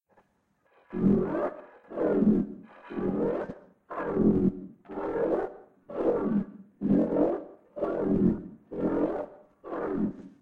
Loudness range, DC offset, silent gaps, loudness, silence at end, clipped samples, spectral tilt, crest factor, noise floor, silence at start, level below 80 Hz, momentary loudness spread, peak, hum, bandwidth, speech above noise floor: 1 LU; under 0.1%; none; -29 LUFS; 0.1 s; under 0.1%; -11 dB/octave; 18 dB; -71 dBFS; 0.9 s; -52 dBFS; 16 LU; -12 dBFS; none; 4.1 kHz; 46 dB